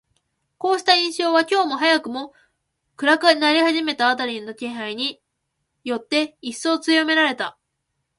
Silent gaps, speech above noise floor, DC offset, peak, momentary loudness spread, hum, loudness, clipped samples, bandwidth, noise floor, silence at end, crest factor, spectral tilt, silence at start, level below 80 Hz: none; 56 dB; under 0.1%; -2 dBFS; 13 LU; none; -20 LUFS; under 0.1%; 11.5 kHz; -76 dBFS; 0.7 s; 20 dB; -2 dB/octave; 0.6 s; -72 dBFS